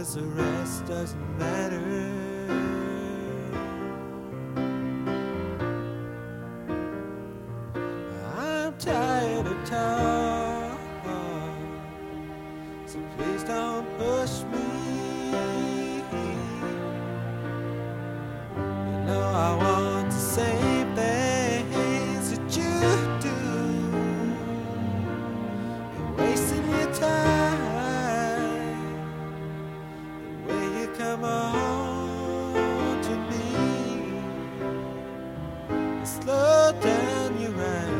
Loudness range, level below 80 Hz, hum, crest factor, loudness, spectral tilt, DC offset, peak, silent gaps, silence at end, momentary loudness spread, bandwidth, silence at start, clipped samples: 7 LU; -50 dBFS; none; 20 dB; -28 LUFS; -5.5 dB/octave; under 0.1%; -8 dBFS; none; 0 s; 12 LU; 16.5 kHz; 0 s; under 0.1%